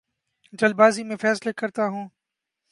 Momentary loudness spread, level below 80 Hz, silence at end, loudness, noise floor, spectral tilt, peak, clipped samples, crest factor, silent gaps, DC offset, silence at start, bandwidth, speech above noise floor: 13 LU; -76 dBFS; 0.65 s; -22 LUFS; -84 dBFS; -5 dB/octave; -4 dBFS; under 0.1%; 20 dB; none; under 0.1%; 0.55 s; 11.5 kHz; 63 dB